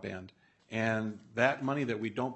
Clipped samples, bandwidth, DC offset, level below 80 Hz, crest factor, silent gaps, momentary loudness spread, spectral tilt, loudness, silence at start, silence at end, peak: under 0.1%; 8.4 kHz; under 0.1%; -74 dBFS; 22 dB; none; 11 LU; -6.5 dB/octave; -33 LUFS; 0 s; 0 s; -12 dBFS